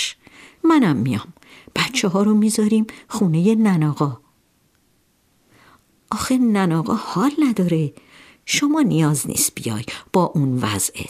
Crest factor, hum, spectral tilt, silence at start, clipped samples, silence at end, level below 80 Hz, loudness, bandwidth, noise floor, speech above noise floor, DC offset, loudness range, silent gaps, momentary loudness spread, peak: 16 dB; none; -5 dB/octave; 0 s; under 0.1%; 0 s; -58 dBFS; -19 LUFS; 16 kHz; -62 dBFS; 43 dB; under 0.1%; 4 LU; none; 10 LU; -4 dBFS